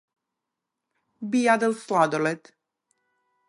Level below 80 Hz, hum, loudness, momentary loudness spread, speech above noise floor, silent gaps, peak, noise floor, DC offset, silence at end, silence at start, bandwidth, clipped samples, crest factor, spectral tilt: -82 dBFS; none; -23 LUFS; 13 LU; 61 dB; none; -6 dBFS; -85 dBFS; under 0.1%; 1.1 s; 1.2 s; 11.5 kHz; under 0.1%; 22 dB; -5 dB/octave